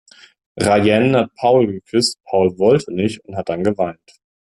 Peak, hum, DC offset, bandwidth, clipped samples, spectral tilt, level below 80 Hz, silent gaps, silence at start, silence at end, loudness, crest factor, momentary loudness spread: -2 dBFS; none; under 0.1%; 12.5 kHz; under 0.1%; -5.5 dB/octave; -54 dBFS; none; 0.55 s; 0.65 s; -17 LUFS; 14 dB; 9 LU